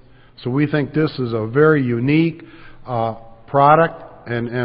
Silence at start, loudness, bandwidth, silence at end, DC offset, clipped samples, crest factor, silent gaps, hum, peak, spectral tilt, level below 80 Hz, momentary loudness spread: 0.4 s; -18 LUFS; 5.2 kHz; 0 s; under 0.1%; under 0.1%; 18 dB; none; none; 0 dBFS; -12.5 dB/octave; -48 dBFS; 14 LU